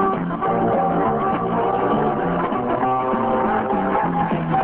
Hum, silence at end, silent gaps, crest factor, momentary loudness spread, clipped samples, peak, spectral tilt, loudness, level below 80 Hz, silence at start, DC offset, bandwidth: none; 0 s; none; 12 dB; 2 LU; under 0.1%; -8 dBFS; -11 dB/octave; -20 LUFS; -46 dBFS; 0 s; under 0.1%; 4 kHz